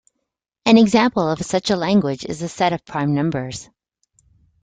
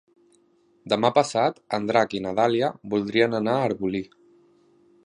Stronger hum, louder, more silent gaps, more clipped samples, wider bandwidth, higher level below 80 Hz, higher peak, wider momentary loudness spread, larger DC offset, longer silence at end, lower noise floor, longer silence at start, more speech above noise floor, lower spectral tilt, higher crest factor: neither; first, -18 LUFS vs -24 LUFS; neither; neither; second, 9.4 kHz vs 11 kHz; first, -54 dBFS vs -64 dBFS; first, 0 dBFS vs -4 dBFS; first, 13 LU vs 8 LU; neither; about the same, 1 s vs 1 s; first, -78 dBFS vs -62 dBFS; second, 0.65 s vs 0.85 s; first, 60 dB vs 39 dB; about the same, -5.5 dB/octave vs -5.5 dB/octave; about the same, 18 dB vs 20 dB